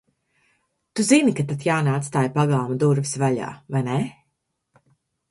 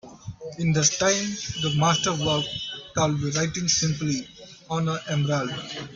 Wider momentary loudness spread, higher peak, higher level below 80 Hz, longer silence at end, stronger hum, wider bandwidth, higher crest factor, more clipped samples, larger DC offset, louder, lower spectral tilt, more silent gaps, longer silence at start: about the same, 10 LU vs 11 LU; about the same, -4 dBFS vs -4 dBFS; second, -62 dBFS vs -54 dBFS; first, 1.2 s vs 0 s; neither; first, 11.5 kHz vs 7.6 kHz; about the same, 20 dB vs 20 dB; neither; neither; about the same, -22 LUFS vs -24 LUFS; first, -6 dB/octave vs -3.5 dB/octave; neither; first, 0.95 s vs 0.05 s